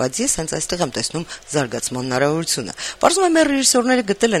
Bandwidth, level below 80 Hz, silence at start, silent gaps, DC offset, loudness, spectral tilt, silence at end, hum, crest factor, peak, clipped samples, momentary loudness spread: 15.5 kHz; -48 dBFS; 0 s; none; under 0.1%; -18 LUFS; -3 dB/octave; 0 s; none; 18 dB; -2 dBFS; under 0.1%; 9 LU